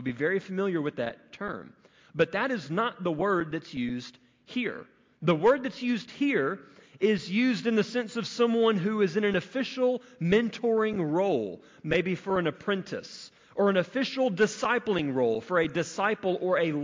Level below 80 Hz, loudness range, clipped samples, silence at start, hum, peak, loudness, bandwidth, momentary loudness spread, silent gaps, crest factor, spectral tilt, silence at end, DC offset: -64 dBFS; 4 LU; under 0.1%; 0 s; none; -12 dBFS; -28 LUFS; 7.6 kHz; 12 LU; none; 16 dB; -6 dB/octave; 0 s; under 0.1%